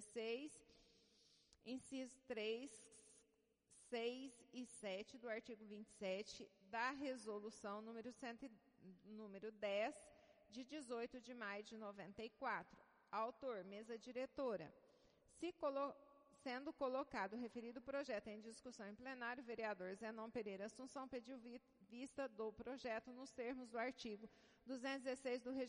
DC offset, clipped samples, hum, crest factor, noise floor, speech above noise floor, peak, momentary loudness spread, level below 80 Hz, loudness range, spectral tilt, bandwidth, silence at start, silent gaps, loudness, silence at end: under 0.1%; under 0.1%; none; 18 dB; -82 dBFS; 32 dB; -32 dBFS; 13 LU; -84 dBFS; 3 LU; -4 dB/octave; 10.5 kHz; 0 s; none; -51 LUFS; 0 s